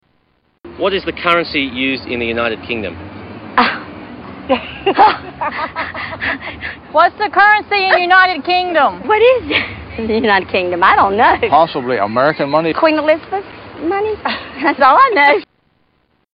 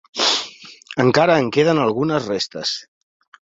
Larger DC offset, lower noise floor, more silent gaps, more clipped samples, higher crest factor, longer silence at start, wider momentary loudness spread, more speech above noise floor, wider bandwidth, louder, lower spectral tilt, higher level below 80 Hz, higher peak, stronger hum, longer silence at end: neither; first, -60 dBFS vs -39 dBFS; neither; neither; about the same, 14 dB vs 18 dB; first, 0.65 s vs 0.15 s; first, 14 LU vs 11 LU; first, 46 dB vs 22 dB; second, 5.6 kHz vs 7.8 kHz; first, -14 LUFS vs -18 LUFS; first, -7 dB/octave vs -4.5 dB/octave; first, -44 dBFS vs -58 dBFS; about the same, 0 dBFS vs -2 dBFS; neither; first, 0.9 s vs 0.65 s